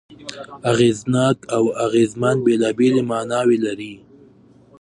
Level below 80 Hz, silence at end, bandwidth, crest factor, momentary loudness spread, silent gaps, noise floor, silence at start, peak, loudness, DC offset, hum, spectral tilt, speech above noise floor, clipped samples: -58 dBFS; 0.85 s; 11.5 kHz; 16 dB; 15 LU; none; -49 dBFS; 0.1 s; -2 dBFS; -18 LUFS; under 0.1%; none; -6 dB/octave; 31 dB; under 0.1%